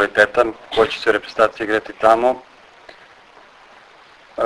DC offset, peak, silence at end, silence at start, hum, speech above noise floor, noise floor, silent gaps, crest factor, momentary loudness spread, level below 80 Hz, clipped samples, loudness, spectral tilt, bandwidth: under 0.1%; 0 dBFS; 0 s; 0 s; none; 29 dB; -47 dBFS; none; 20 dB; 7 LU; -52 dBFS; under 0.1%; -17 LUFS; -4 dB/octave; 11 kHz